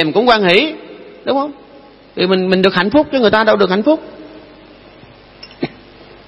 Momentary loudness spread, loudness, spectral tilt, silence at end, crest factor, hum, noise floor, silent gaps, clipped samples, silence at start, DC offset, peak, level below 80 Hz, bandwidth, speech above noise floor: 15 LU; -13 LUFS; -7 dB/octave; 0.6 s; 16 dB; none; -41 dBFS; none; under 0.1%; 0 s; under 0.1%; 0 dBFS; -50 dBFS; 10.5 kHz; 29 dB